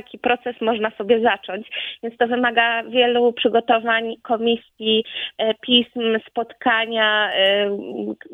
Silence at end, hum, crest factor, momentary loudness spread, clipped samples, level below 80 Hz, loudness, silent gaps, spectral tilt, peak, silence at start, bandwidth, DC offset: 0 s; none; 20 dB; 10 LU; under 0.1%; -64 dBFS; -20 LUFS; none; -6 dB/octave; 0 dBFS; 0.1 s; 4 kHz; under 0.1%